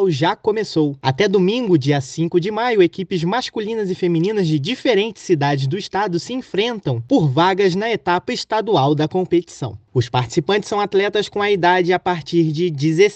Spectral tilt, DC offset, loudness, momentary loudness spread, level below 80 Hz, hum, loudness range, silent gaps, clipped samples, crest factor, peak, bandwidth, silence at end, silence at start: -6 dB/octave; under 0.1%; -18 LUFS; 6 LU; -58 dBFS; none; 1 LU; none; under 0.1%; 16 dB; -2 dBFS; 8.6 kHz; 0 s; 0 s